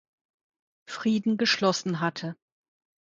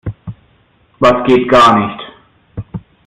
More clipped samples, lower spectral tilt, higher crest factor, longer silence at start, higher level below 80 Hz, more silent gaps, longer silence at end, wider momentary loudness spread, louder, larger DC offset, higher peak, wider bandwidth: neither; second, -4.5 dB/octave vs -6 dB/octave; first, 20 dB vs 14 dB; first, 0.9 s vs 0.05 s; second, -72 dBFS vs -40 dBFS; neither; first, 0.7 s vs 0.3 s; second, 15 LU vs 24 LU; second, -26 LUFS vs -10 LUFS; neither; second, -10 dBFS vs 0 dBFS; second, 7.8 kHz vs 11.5 kHz